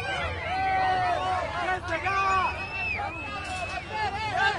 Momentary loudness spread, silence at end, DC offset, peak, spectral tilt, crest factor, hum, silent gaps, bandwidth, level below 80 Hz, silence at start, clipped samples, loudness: 7 LU; 0 s; under 0.1%; -14 dBFS; -4 dB/octave; 14 dB; none; none; 11.5 kHz; -46 dBFS; 0 s; under 0.1%; -28 LUFS